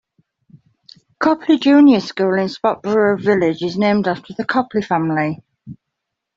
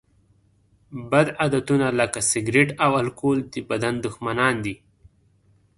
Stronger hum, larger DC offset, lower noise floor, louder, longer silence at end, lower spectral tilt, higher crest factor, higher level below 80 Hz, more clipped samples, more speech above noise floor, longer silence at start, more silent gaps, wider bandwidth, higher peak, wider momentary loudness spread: neither; neither; first, -79 dBFS vs -61 dBFS; first, -16 LUFS vs -22 LUFS; second, 0.65 s vs 1.05 s; first, -7 dB/octave vs -4.5 dB/octave; second, 14 dB vs 22 dB; about the same, -60 dBFS vs -56 dBFS; neither; first, 63 dB vs 39 dB; first, 1.2 s vs 0.9 s; neither; second, 7.4 kHz vs 11.5 kHz; about the same, -2 dBFS vs -2 dBFS; about the same, 9 LU vs 9 LU